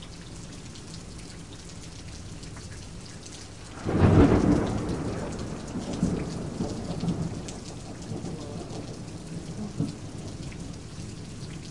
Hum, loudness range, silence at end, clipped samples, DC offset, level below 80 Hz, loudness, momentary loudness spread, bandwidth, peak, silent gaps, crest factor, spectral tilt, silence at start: none; 15 LU; 0 s; under 0.1%; 0.3%; -42 dBFS; -29 LUFS; 18 LU; 11.5 kHz; -6 dBFS; none; 24 dB; -6.5 dB/octave; 0 s